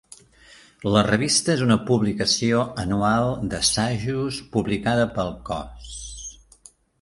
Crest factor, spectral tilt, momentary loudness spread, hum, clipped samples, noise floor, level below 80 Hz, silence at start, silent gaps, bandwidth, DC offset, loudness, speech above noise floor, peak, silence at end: 22 dB; -4.5 dB/octave; 15 LU; none; under 0.1%; -52 dBFS; -44 dBFS; 0.8 s; none; 11.5 kHz; under 0.1%; -22 LUFS; 30 dB; -2 dBFS; 0.7 s